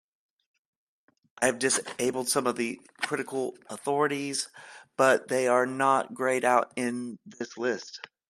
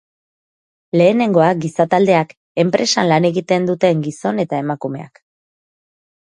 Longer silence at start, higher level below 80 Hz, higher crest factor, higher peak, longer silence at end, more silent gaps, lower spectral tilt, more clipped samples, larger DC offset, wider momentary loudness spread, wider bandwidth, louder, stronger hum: first, 1.4 s vs 0.95 s; second, -76 dBFS vs -62 dBFS; first, 22 dB vs 16 dB; second, -8 dBFS vs 0 dBFS; second, 0.3 s vs 1.3 s; second, none vs 2.37-2.55 s; second, -3 dB/octave vs -5.5 dB/octave; neither; neither; first, 13 LU vs 9 LU; first, 14 kHz vs 10.5 kHz; second, -27 LUFS vs -16 LUFS; neither